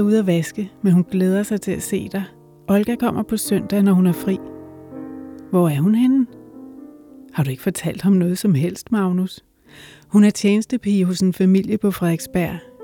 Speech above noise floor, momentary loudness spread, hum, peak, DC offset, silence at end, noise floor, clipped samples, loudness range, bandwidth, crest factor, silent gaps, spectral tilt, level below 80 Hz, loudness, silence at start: 24 dB; 18 LU; none; -4 dBFS; under 0.1%; 0 s; -42 dBFS; under 0.1%; 3 LU; 18.5 kHz; 14 dB; none; -7 dB/octave; -54 dBFS; -19 LUFS; 0 s